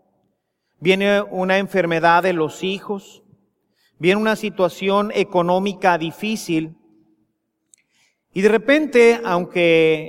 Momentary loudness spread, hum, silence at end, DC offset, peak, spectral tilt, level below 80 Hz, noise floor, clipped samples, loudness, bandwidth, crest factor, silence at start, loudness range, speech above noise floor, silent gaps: 10 LU; none; 0 s; under 0.1%; -2 dBFS; -5.5 dB/octave; -64 dBFS; -72 dBFS; under 0.1%; -18 LUFS; 16 kHz; 18 dB; 0.8 s; 3 LU; 54 dB; none